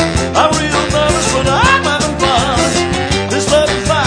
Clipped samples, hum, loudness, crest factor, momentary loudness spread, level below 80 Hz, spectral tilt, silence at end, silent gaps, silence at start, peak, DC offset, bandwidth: under 0.1%; none; -12 LUFS; 12 dB; 4 LU; -26 dBFS; -3.5 dB/octave; 0 s; none; 0 s; 0 dBFS; under 0.1%; 10.5 kHz